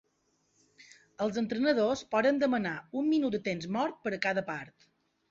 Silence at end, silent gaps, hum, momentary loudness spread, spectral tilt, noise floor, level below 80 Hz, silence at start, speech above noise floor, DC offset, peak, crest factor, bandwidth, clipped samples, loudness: 0.6 s; none; none; 8 LU; -5.5 dB/octave; -74 dBFS; -70 dBFS; 0.8 s; 44 dB; under 0.1%; -12 dBFS; 20 dB; 7.6 kHz; under 0.1%; -31 LUFS